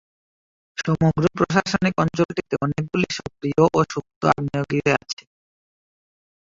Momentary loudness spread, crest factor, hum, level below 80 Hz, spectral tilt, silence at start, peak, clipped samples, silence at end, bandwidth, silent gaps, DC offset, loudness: 8 LU; 22 dB; none; -50 dBFS; -6 dB/octave; 0.75 s; -2 dBFS; under 0.1%; 1.45 s; 7.8 kHz; 2.25-2.29 s, 4.16-4.21 s; under 0.1%; -22 LUFS